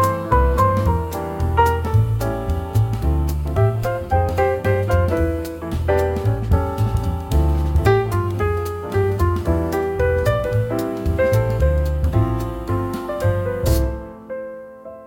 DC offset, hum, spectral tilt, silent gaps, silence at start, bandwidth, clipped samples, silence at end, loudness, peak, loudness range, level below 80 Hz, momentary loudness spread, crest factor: under 0.1%; none; -7.5 dB/octave; none; 0 s; 17 kHz; under 0.1%; 0 s; -20 LUFS; -2 dBFS; 1 LU; -26 dBFS; 7 LU; 16 dB